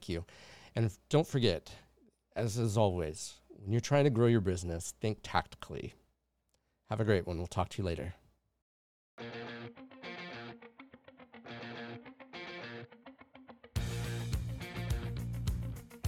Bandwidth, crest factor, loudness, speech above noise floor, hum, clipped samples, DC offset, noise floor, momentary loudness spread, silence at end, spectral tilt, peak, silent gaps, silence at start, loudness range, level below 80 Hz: 15.5 kHz; 22 dB; -35 LUFS; 46 dB; none; under 0.1%; under 0.1%; -79 dBFS; 21 LU; 0 s; -6 dB/octave; -14 dBFS; 8.62-9.18 s; 0 s; 15 LU; -50 dBFS